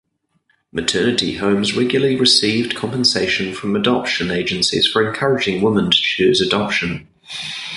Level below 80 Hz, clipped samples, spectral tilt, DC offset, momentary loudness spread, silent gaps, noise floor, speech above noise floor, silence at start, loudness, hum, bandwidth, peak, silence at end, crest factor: -48 dBFS; under 0.1%; -4 dB/octave; under 0.1%; 9 LU; none; -64 dBFS; 47 dB; 0.75 s; -16 LUFS; none; 11.5 kHz; 0 dBFS; 0 s; 18 dB